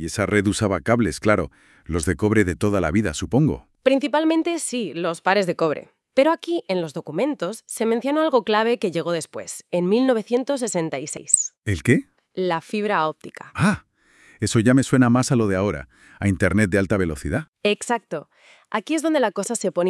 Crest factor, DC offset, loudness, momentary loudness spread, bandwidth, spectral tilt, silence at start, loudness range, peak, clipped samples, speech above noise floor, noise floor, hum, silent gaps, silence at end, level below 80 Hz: 22 dB; under 0.1%; -22 LUFS; 9 LU; 12 kHz; -5 dB/octave; 0 s; 3 LU; 0 dBFS; under 0.1%; 33 dB; -54 dBFS; none; 11.58-11.62 s, 17.48-17.53 s; 0 s; -48 dBFS